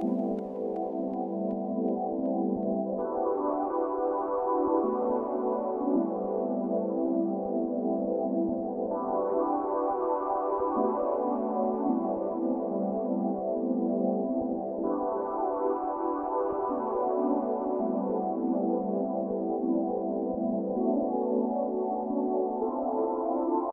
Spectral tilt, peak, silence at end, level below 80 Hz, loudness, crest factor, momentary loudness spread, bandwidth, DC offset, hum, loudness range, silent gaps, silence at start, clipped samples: -12.5 dB/octave; -14 dBFS; 0 s; -64 dBFS; -30 LUFS; 14 dB; 3 LU; 2.6 kHz; under 0.1%; none; 1 LU; none; 0 s; under 0.1%